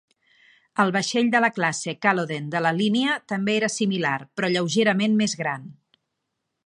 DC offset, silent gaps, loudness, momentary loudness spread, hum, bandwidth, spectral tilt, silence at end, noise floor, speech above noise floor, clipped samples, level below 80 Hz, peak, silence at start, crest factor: under 0.1%; none; -23 LUFS; 6 LU; none; 11.5 kHz; -4.5 dB/octave; 0.95 s; -79 dBFS; 57 dB; under 0.1%; -72 dBFS; -4 dBFS; 0.75 s; 20 dB